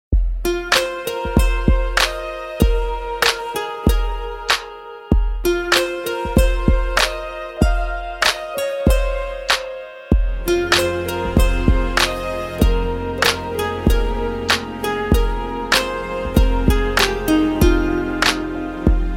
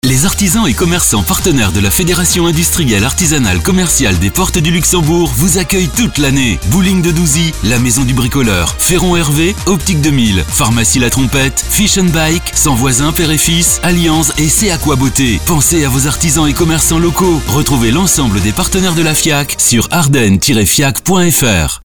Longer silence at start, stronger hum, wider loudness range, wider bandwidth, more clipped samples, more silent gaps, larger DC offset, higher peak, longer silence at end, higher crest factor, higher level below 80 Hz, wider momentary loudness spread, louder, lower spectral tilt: about the same, 0.1 s vs 0 s; neither; about the same, 2 LU vs 1 LU; second, 17 kHz vs over 20 kHz; neither; neither; second, under 0.1% vs 3%; about the same, -2 dBFS vs 0 dBFS; about the same, 0 s vs 0 s; first, 16 dB vs 10 dB; about the same, -22 dBFS vs -22 dBFS; first, 8 LU vs 3 LU; second, -19 LUFS vs -10 LUFS; about the same, -4.5 dB/octave vs -3.5 dB/octave